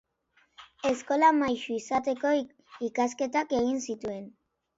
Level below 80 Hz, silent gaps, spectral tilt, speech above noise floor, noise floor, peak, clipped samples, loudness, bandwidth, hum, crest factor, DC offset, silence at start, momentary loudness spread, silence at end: -66 dBFS; none; -4 dB/octave; 41 dB; -69 dBFS; -10 dBFS; under 0.1%; -28 LUFS; 8 kHz; none; 20 dB; under 0.1%; 0.6 s; 14 LU; 0.5 s